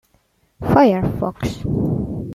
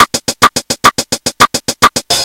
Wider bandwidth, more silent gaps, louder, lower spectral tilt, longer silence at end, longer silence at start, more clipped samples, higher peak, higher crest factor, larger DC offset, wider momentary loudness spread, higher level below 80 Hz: second, 14.5 kHz vs over 20 kHz; neither; second, -19 LUFS vs -10 LUFS; first, -8 dB/octave vs -1.5 dB/octave; about the same, 0 s vs 0 s; first, 0.6 s vs 0 s; second, under 0.1% vs 2%; about the same, -2 dBFS vs 0 dBFS; first, 18 dB vs 12 dB; second, under 0.1% vs 0.1%; first, 11 LU vs 1 LU; about the same, -38 dBFS vs -42 dBFS